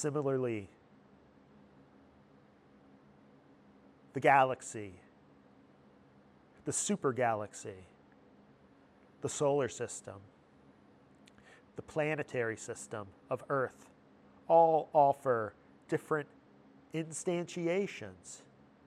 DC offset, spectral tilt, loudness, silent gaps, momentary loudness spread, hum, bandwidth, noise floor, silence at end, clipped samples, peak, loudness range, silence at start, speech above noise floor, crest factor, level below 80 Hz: under 0.1%; -5 dB/octave; -33 LUFS; none; 23 LU; none; 13.5 kHz; -63 dBFS; 0.5 s; under 0.1%; -12 dBFS; 9 LU; 0 s; 30 dB; 24 dB; -76 dBFS